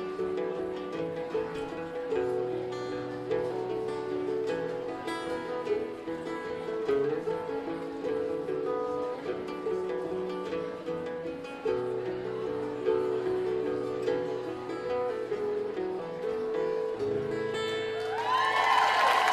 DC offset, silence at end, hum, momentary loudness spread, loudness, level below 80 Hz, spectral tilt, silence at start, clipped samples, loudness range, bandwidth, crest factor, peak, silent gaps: under 0.1%; 0 s; none; 7 LU; -32 LUFS; -64 dBFS; -5 dB/octave; 0 s; under 0.1%; 3 LU; 14 kHz; 18 dB; -12 dBFS; none